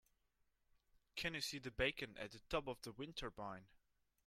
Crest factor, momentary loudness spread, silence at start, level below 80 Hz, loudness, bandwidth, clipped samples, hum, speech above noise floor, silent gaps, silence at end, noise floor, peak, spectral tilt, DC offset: 24 dB; 11 LU; 1.15 s; -64 dBFS; -46 LUFS; 16 kHz; under 0.1%; none; 36 dB; none; 0.5 s; -82 dBFS; -26 dBFS; -3.5 dB/octave; under 0.1%